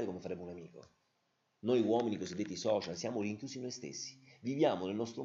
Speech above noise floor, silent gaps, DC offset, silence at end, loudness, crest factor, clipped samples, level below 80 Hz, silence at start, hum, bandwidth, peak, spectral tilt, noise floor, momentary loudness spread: 43 dB; none; under 0.1%; 0 s; -37 LUFS; 18 dB; under 0.1%; -78 dBFS; 0 s; none; 7.8 kHz; -18 dBFS; -5 dB/octave; -80 dBFS; 12 LU